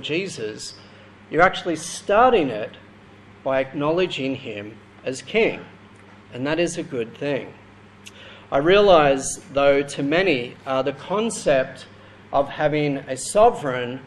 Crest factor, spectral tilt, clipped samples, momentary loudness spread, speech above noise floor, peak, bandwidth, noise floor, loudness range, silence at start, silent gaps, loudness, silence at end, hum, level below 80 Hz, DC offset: 20 dB; -4.5 dB/octave; under 0.1%; 17 LU; 26 dB; -2 dBFS; 12.5 kHz; -47 dBFS; 7 LU; 0 s; none; -21 LUFS; 0 s; none; -48 dBFS; under 0.1%